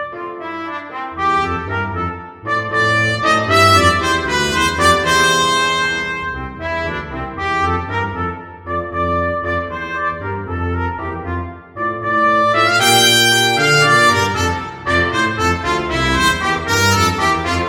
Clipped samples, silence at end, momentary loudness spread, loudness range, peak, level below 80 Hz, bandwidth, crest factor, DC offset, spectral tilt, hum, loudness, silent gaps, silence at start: under 0.1%; 0 s; 14 LU; 9 LU; 0 dBFS; -36 dBFS; over 20 kHz; 16 dB; under 0.1%; -3 dB/octave; none; -15 LUFS; none; 0 s